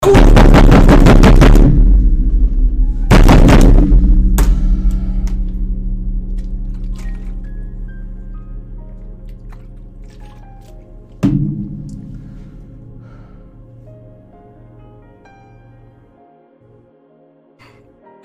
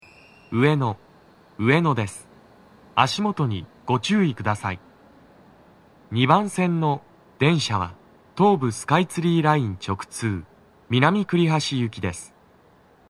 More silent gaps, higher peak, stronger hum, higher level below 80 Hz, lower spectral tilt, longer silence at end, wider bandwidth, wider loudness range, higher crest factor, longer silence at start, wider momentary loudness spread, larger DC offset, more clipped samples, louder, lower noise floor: neither; about the same, -2 dBFS vs 0 dBFS; neither; first, -14 dBFS vs -60 dBFS; about the same, -7 dB/octave vs -6 dB/octave; first, 5.6 s vs 0.85 s; about the same, 13.5 kHz vs 13 kHz; first, 24 LU vs 3 LU; second, 10 dB vs 22 dB; second, 0 s vs 0.5 s; first, 25 LU vs 11 LU; neither; neither; first, -12 LUFS vs -22 LUFS; second, -49 dBFS vs -55 dBFS